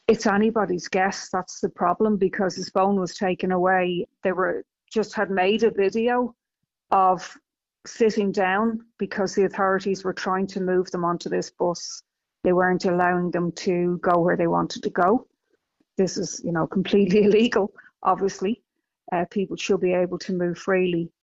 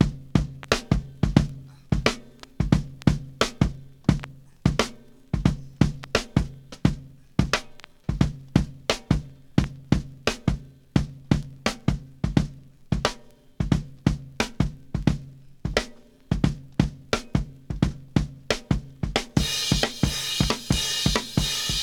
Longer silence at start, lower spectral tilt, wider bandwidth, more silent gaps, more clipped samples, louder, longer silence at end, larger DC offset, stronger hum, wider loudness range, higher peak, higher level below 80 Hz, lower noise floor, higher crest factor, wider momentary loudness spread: about the same, 0.1 s vs 0 s; about the same, -5 dB/octave vs -5 dB/octave; second, 8 kHz vs 18.5 kHz; neither; neither; first, -23 LUFS vs -26 LUFS; first, 0.2 s vs 0 s; neither; neither; about the same, 2 LU vs 3 LU; second, -6 dBFS vs -2 dBFS; second, -58 dBFS vs -34 dBFS; first, -82 dBFS vs -45 dBFS; second, 16 dB vs 24 dB; about the same, 8 LU vs 8 LU